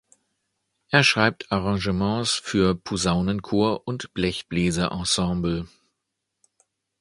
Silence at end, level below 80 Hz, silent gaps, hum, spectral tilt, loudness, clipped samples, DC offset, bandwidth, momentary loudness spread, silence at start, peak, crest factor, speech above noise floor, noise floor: 1.35 s; -44 dBFS; none; none; -4.5 dB/octave; -23 LUFS; under 0.1%; under 0.1%; 11.5 kHz; 8 LU; 0.9 s; 0 dBFS; 24 dB; 57 dB; -80 dBFS